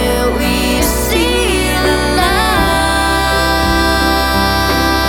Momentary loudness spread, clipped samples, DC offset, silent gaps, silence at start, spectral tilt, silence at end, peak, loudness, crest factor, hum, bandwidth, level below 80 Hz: 2 LU; under 0.1%; under 0.1%; none; 0 s; -4 dB/octave; 0 s; 0 dBFS; -12 LUFS; 12 dB; none; 19.5 kHz; -20 dBFS